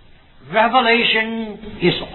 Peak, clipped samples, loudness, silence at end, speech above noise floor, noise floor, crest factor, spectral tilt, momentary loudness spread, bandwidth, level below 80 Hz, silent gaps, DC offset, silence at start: -2 dBFS; under 0.1%; -16 LUFS; 0 s; 27 dB; -44 dBFS; 16 dB; -7.5 dB/octave; 12 LU; 4.3 kHz; -44 dBFS; none; under 0.1%; 0.45 s